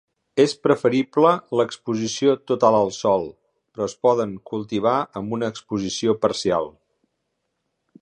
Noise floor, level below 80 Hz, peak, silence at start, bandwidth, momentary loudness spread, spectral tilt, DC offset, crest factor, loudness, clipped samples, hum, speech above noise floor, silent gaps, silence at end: -76 dBFS; -60 dBFS; -2 dBFS; 0.35 s; 10 kHz; 10 LU; -5 dB/octave; under 0.1%; 20 dB; -21 LUFS; under 0.1%; none; 55 dB; none; 1.3 s